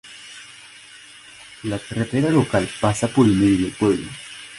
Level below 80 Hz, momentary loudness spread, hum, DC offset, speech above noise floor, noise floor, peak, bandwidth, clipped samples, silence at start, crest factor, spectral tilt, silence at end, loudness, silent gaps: -46 dBFS; 24 LU; none; under 0.1%; 25 dB; -44 dBFS; -2 dBFS; 11.5 kHz; under 0.1%; 0.05 s; 18 dB; -6 dB/octave; 0 s; -20 LUFS; none